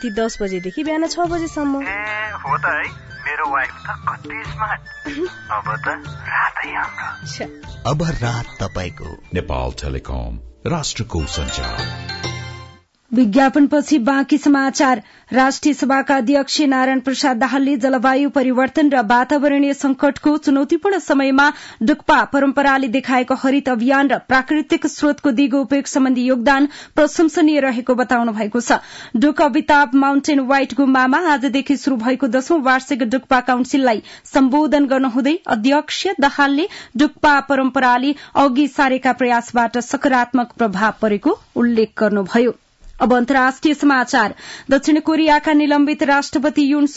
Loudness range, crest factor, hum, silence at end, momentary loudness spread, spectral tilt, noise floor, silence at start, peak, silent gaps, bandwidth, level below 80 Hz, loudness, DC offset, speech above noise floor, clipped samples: 8 LU; 12 dB; none; 0 s; 11 LU; -5 dB/octave; -43 dBFS; 0 s; -4 dBFS; none; 8 kHz; -40 dBFS; -17 LUFS; under 0.1%; 27 dB; under 0.1%